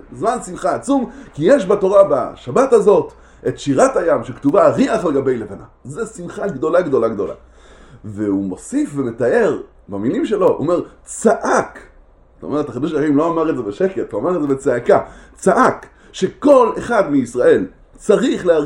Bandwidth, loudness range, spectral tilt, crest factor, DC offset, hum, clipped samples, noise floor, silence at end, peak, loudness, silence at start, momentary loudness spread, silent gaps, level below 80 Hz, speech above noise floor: 11.5 kHz; 6 LU; -6 dB/octave; 16 dB; under 0.1%; none; under 0.1%; -47 dBFS; 0 s; 0 dBFS; -16 LUFS; 0.1 s; 15 LU; none; -46 dBFS; 31 dB